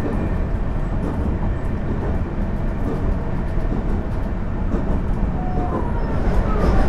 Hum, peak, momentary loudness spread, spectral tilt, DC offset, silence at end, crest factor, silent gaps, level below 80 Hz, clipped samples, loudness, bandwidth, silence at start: none; -6 dBFS; 3 LU; -9 dB/octave; under 0.1%; 0 s; 14 dB; none; -22 dBFS; under 0.1%; -24 LUFS; 6.4 kHz; 0 s